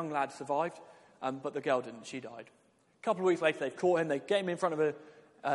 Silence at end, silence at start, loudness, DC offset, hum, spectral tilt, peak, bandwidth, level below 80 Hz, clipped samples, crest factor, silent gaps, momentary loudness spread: 0 s; 0 s; -33 LUFS; under 0.1%; none; -5.5 dB/octave; -12 dBFS; 11.5 kHz; -82 dBFS; under 0.1%; 20 dB; none; 14 LU